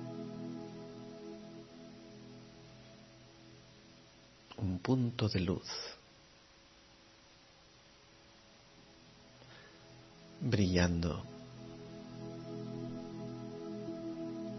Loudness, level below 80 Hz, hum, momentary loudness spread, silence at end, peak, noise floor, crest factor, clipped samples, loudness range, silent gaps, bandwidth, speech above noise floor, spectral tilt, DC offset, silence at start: -39 LUFS; -60 dBFS; none; 26 LU; 0 s; -16 dBFS; -62 dBFS; 26 dB; under 0.1%; 21 LU; none; 6 kHz; 29 dB; -6 dB/octave; under 0.1%; 0 s